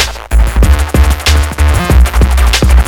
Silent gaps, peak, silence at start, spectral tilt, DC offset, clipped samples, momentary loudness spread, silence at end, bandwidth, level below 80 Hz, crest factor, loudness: none; 0 dBFS; 0 s; -4.5 dB/octave; under 0.1%; 1%; 3 LU; 0 s; 18 kHz; -8 dBFS; 8 dB; -10 LUFS